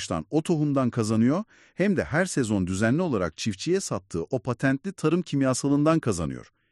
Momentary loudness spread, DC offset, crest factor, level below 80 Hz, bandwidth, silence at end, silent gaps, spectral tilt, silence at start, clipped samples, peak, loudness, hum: 7 LU; under 0.1%; 16 dB; -54 dBFS; 12 kHz; 0.3 s; none; -6 dB/octave; 0 s; under 0.1%; -8 dBFS; -25 LUFS; none